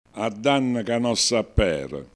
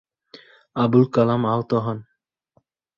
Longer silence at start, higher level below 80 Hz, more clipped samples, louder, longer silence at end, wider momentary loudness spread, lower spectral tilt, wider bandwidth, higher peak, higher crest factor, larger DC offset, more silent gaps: second, 0.15 s vs 0.75 s; first, -36 dBFS vs -60 dBFS; neither; second, -23 LUFS vs -20 LUFS; second, 0.1 s vs 0.95 s; second, 6 LU vs 14 LU; second, -4 dB/octave vs -9.5 dB/octave; first, 11 kHz vs 7 kHz; about the same, -6 dBFS vs -4 dBFS; about the same, 18 dB vs 18 dB; neither; neither